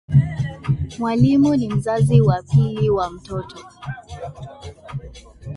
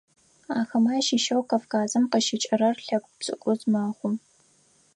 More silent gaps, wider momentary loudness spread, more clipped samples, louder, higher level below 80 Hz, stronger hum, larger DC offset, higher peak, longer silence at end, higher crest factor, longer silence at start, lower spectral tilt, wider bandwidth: neither; first, 20 LU vs 8 LU; neither; first, -19 LUFS vs -25 LUFS; first, -40 dBFS vs -78 dBFS; neither; neither; first, -2 dBFS vs -10 dBFS; second, 0 s vs 0.75 s; about the same, 18 dB vs 16 dB; second, 0.1 s vs 0.5 s; first, -8.5 dB/octave vs -4 dB/octave; about the same, 11 kHz vs 10.5 kHz